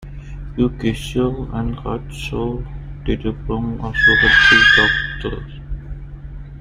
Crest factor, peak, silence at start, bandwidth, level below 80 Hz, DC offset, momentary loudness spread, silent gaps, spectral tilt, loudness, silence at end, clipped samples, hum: 18 dB; 0 dBFS; 0 s; 15 kHz; -30 dBFS; under 0.1%; 24 LU; none; -4.5 dB/octave; -16 LUFS; 0 s; under 0.1%; none